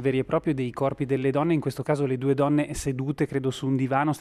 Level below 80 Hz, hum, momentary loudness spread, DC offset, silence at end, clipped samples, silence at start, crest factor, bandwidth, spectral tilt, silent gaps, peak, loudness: -50 dBFS; none; 4 LU; under 0.1%; 0 s; under 0.1%; 0 s; 16 dB; 13.5 kHz; -7 dB/octave; none; -8 dBFS; -26 LUFS